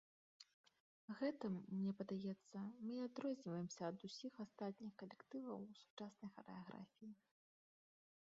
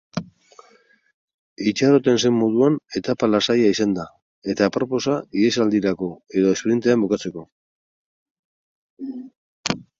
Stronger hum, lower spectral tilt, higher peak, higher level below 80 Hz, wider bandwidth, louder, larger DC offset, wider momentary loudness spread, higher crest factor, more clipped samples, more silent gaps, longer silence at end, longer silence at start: neither; first, -6.5 dB/octave vs -5 dB/octave; second, -34 dBFS vs 0 dBFS; second, under -90 dBFS vs -60 dBFS; about the same, 7.4 kHz vs 7.8 kHz; second, -51 LUFS vs -20 LUFS; neither; about the same, 16 LU vs 16 LU; about the same, 18 dB vs 22 dB; neither; second, 0.54-0.64 s, 0.80-1.08 s, 5.90-5.97 s vs 1.14-1.28 s, 1.34-1.56 s, 4.22-4.42 s, 7.52-8.97 s, 9.37-9.64 s; first, 1.15 s vs 0.15 s; first, 0.4 s vs 0.15 s